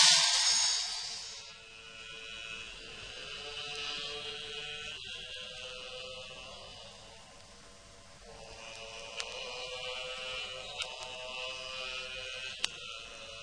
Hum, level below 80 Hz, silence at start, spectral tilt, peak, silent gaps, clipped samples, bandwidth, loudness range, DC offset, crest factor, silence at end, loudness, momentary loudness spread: none; -64 dBFS; 0 s; 1.5 dB/octave; -8 dBFS; none; under 0.1%; 10.5 kHz; 10 LU; under 0.1%; 30 dB; 0 s; -35 LUFS; 19 LU